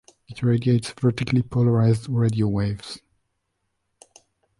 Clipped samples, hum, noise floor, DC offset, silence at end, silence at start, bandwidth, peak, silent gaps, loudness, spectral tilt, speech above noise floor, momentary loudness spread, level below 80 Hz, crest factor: under 0.1%; none; -75 dBFS; under 0.1%; 1.6 s; 0.3 s; 11.5 kHz; -8 dBFS; none; -22 LUFS; -7.5 dB/octave; 54 dB; 14 LU; -50 dBFS; 14 dB